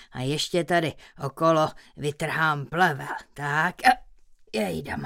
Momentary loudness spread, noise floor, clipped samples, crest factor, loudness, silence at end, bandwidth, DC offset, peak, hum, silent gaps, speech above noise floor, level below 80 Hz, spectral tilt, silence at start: 11 LU; -51 dBFS; under 0.1%; 22 dB; -25 LUFS; 0 s; 17 kHz; under 0.1%; -4 dBFS; none; none; 26 dB; -56 dBFS; -5 dB/octave; 0 s